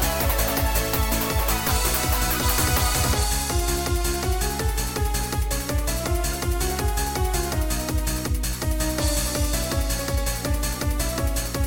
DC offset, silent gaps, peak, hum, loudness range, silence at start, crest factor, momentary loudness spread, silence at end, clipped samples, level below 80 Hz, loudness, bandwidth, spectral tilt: under 0.1%; none; -8 dBFS; none; 3 LU; 0 s; 16 dB; 5 LU; 0 s; under 0.1%; -26 dBFS; -24 LUFS; 17 kHz; -3.5 dB/octave